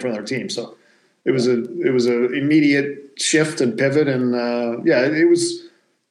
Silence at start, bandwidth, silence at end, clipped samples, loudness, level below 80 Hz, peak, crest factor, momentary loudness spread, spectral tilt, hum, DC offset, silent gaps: 0 s; 12 kHz; 0.45 s; under 0.1%; -19 LUFS; -78 dBFS; -4 dBFS; 14 dB; 10 LU; -4.5 dB/octave; none; under 0.1%; none